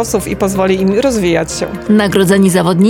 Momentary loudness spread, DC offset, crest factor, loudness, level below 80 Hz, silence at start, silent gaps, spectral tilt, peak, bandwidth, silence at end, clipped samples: 6 LU; under 0.1%; 12 dB; -12 LUFS; -36 dBFS; 0 s; none; -5.5 dB/octave; 0 dBFS; 17.5 kHz; 0 s; under 0.1%